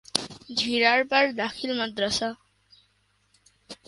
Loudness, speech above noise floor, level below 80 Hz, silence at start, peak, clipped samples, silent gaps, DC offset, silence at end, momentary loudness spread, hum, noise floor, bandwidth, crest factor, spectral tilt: -25 LUFS; 43 dB; -62 dBFS; 0.15 s; 0 dBFS; under 0.1%; none; under 0.1%; 0.15 s; 10 LU; 50 Hz at -55 dBFS; -68 dBFS; 11.5 kHz; 26 dB; -2.5 dB/octave